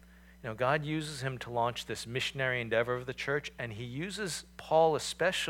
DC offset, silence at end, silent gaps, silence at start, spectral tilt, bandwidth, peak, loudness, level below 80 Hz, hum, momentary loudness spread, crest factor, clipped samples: under 0.1%; 0 s; none; 0.05 s; -4 dB/octave; 17 kHz; -14 dBFS; -33 LUFS; -60 dBFS; none; 11 LU; 20 dB; under 0.1%